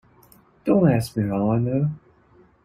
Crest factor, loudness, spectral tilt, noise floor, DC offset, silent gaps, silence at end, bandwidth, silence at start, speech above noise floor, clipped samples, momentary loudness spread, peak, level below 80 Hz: 18 dB; -22 LUFS; -8.5 dB/octave; -55 dBFS; under 0.1%; none; 0.7 s; 15.5 kHz; 0.65 s; 35 dB; under 0.1%; 11 LU; -6 dBFS; -52 dBFS